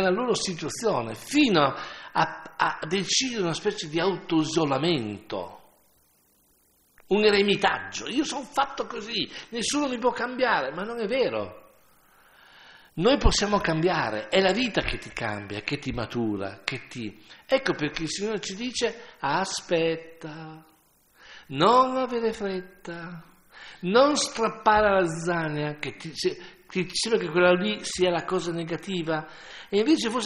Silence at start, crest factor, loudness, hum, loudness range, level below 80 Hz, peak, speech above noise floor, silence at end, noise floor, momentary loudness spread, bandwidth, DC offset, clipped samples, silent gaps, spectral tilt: 0 s; 22 dB; -26 LUFS; none; 4 LU; -44 dBFS; -4 dBFS; 38 dB; 0 s; -64 dBFS; 14 LU; 15 kHz; under 0.1%; under 0.1%; none; -4 dB/octave